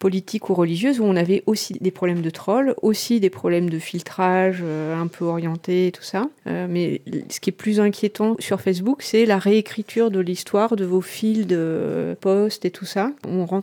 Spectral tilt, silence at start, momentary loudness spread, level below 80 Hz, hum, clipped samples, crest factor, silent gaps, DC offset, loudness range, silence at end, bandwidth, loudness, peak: -6 dB/octave; 0 s; 7 LU; -70 dBFS; none; under 0.1%; 14 dB; none; under 0.1%; 3 LU; 0 s; 19.5 kHz; -21 LUFS; -6 dBFS